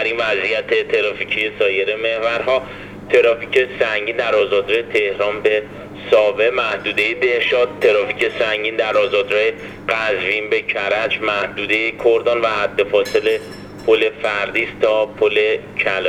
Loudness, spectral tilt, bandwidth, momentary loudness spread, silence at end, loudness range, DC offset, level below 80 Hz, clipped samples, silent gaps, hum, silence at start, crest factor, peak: -17 LUFS; -4 dB/octave; 13.5 kHz; 4 LU; 0 s; 1 LU; under 0.1%; -52 dBFS; under 0.1%; none; 50 Hz at -45 dBFS; 0 s; 16 dB; -2 dBFS